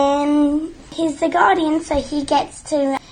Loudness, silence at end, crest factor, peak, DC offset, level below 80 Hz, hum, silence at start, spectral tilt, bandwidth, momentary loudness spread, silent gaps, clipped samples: -18 LUFS; 0.15 s; 16 dB; -2 dBFS; under 0.1%; -42 dBFS; none; 0 s; -4.5 dB/octave; 9.8 kHz; 8 LU; none; under 0.1%